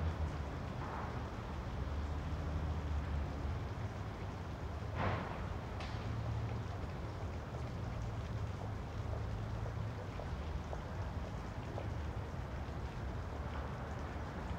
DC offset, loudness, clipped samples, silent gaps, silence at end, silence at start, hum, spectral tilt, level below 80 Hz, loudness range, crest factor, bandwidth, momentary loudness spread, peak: under 0.1%; -43 LUFS; under 0.1%; none; 0 s; 0 s; none; -7 dB/octave; -46 dBFS; 2 LU; 16 dB; 9.6 kHz; 4 LU; -24 dBFS